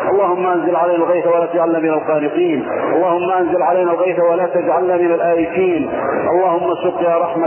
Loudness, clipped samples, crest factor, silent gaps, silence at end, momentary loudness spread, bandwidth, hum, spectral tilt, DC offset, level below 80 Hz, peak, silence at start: -15 LUFS; under 0.1%; 12 dB; none; 0 s; 3 LU; 3.2 kHz; none; -10.5 dB/octave; under 0.1%; -56 dBFS; -4 dBFS; 0 s